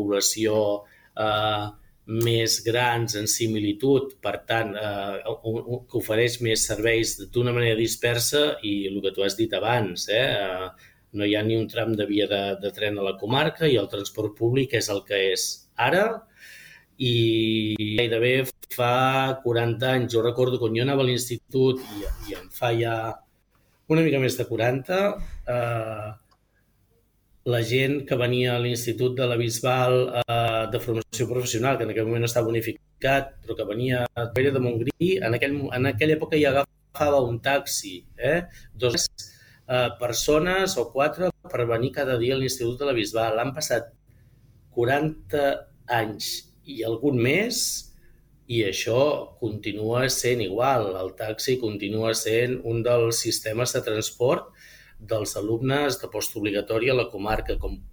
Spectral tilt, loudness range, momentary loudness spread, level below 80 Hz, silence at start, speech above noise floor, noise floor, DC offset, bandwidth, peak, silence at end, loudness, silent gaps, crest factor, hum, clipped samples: -4.5 dB/octave; 3 LU; 9 LU; -48 dBFS; 0 s; 41 dB; -65 dBFS; under 0.1%; over 20 kHz; -6 dBFS; 0 s; -24 LUFS; none; 20 dB; none; under 0.1%